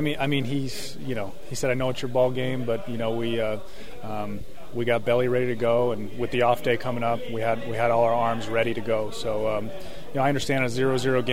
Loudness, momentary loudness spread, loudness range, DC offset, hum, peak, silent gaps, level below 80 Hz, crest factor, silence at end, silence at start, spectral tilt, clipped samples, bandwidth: -26 LUFS; 11 LU; 3 LU; 3%; none; -8 dBFS; none; -50 dBFS; 18 dB; 0 s; 0 s; -5.5 dB/octave; under 0.1%; 16 kHz